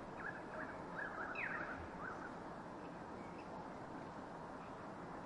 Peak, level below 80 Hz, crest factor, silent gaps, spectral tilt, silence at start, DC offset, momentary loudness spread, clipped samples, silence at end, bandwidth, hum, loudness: -32 dBFS; -68 dBFS; 16 dB; none; -6 dB/octave; 0 s; under 0.1%; 8 LU; under 0.1%; 0 s; 11 kHz; none; -48 LUFS